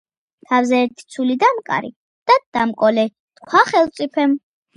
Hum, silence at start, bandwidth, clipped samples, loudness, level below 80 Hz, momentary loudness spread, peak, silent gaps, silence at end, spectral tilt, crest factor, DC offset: none; 0.5 s; 11 kHz; under 0.1%; -18 LUFS; -62 dBFS; 8 LU; 0 dBFS; 1.96-2.26 s, 2.46-2.52 s, 3.20-3.28 s; 0.4 s; -4.5 dB/octave; 18 dB; under 0.1%